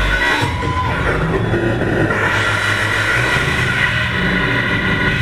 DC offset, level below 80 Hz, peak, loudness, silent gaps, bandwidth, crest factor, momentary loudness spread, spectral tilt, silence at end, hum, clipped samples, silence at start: 0.7%; -28 dBFS; -2 dBFS; -15 LUFS; none; 15.5 kHz; 14 dB; 3 LU; -5 dB/octave; 0 s; none; under 0.1%; 0 s